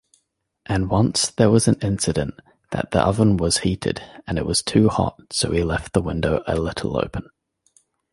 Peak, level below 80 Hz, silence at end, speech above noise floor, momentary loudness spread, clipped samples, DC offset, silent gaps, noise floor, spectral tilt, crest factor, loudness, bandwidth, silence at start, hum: -2 dBFS; -38 dBFS; 0.9 s; 51 dB; 10 LU; under 0.1%; under 0.1%; none; -71 dBFS; -5 dB/octave; 20 dB; -21 LUFS; 11.5 kHz; 0.7 s; none